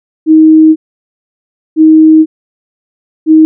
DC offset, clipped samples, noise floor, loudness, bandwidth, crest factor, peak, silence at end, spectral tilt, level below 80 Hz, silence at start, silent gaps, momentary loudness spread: 0.2%; 0.4%; under -90 dBFS; -7 LUFS; 0.4 kHz; 8 dB; 0 dBFS; 0 s; -18 dB/octave; -82 dBFS; 0.25 s; 0.76-1.76 s, 2.26-3.26 s; 13 LU